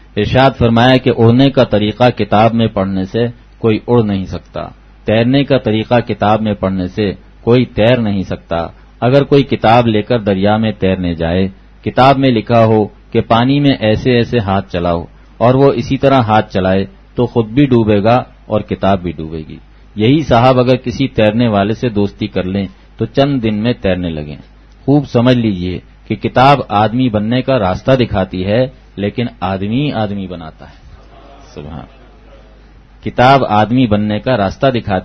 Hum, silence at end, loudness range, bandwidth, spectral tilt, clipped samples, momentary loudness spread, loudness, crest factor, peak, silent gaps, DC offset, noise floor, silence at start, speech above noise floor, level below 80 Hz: none; 0 s; 5 LU; 6.4 kHz; -8 dB/octave; 0.1%; 13 LU; -13 LUFS; 12 dB; 0 dBFS; none; under 0.1%; -40 dBFS; 0.15 s; 28 dB; -38 dBFS